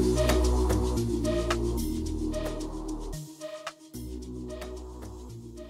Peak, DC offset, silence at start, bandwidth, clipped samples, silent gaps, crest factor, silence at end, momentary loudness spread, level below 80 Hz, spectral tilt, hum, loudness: -12 dBFS; under 0.1%; 0 s; 16 kHz; under 0.1%; none; 18 dB; 0 s; 17 LU; -34 dBFS; -6 dB/octave; none; -31 LUFS